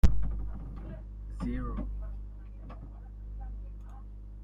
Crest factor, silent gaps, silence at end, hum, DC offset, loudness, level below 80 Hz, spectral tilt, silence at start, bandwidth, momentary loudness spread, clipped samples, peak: 22 dB; none; 0 s; 50 Hz at -40 dBFS; under 0.1%; -41 LUFS; -36 dBFS; -8 dB/octave; 0.05 s; 7.6 kHz; 11 LU; under 0.1%; -10 dBFS